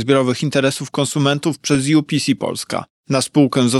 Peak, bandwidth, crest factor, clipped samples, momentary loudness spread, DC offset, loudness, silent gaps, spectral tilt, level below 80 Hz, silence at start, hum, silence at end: -2 dBFS; 12.5 kHz; 16 dB; under 0.1%; 7 LU; under 0.1%; -18 LUFS; 2.90-3.04 s; -5 dB/octave; -58 dBFS; 0 s; none; 0 s